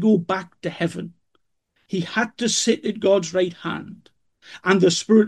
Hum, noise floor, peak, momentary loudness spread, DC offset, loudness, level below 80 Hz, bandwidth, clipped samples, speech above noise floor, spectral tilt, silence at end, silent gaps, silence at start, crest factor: none; -70 dBFS; -4 dBFS; 14 LU; under 0.1%; -22 LUFS; -66 dBFS; 12 kHz; under 0.1%; 49 dB; -4.5 dB/octave; 0 s; none; 0 s; 18 dB